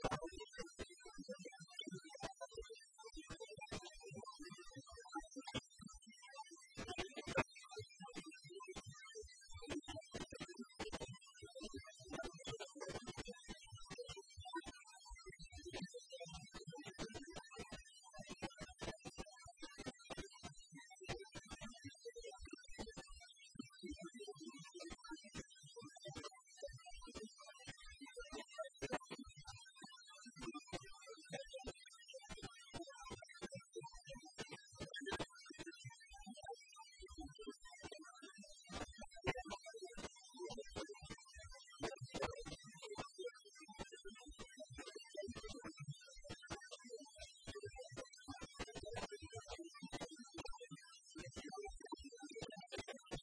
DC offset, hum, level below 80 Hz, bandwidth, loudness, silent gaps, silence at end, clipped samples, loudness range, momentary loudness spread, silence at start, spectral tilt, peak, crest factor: under 0.1%; none; -66 dBFS; 11 kHz; -53 LUFS; none; 0 s; under 0.1%; 5 LU; 9 LU; 0 s; -3.5 dB/octave; -24 dBFS; 30 dB